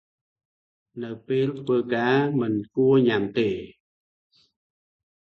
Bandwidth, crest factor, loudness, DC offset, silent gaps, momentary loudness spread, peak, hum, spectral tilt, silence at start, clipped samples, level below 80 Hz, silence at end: 6.2 kHz; 16 dB; -23 LUFS; under 0.1%; none; 16 LU; -8 dBFS; none; -8.5 dB/octave; 0.95 s; under 0.1%; -64 dBFS; 1.55 s